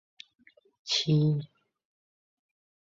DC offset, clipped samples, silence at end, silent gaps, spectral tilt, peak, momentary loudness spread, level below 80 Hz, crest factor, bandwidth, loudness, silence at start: under 0.1%; under 0.1%; 1.5 s; none; -5.5 dB/octave; -14 dBFS; 22 LU; -70 dBFS; 18 dB; 7.8 kHz; -27 LUFS; 0.85 s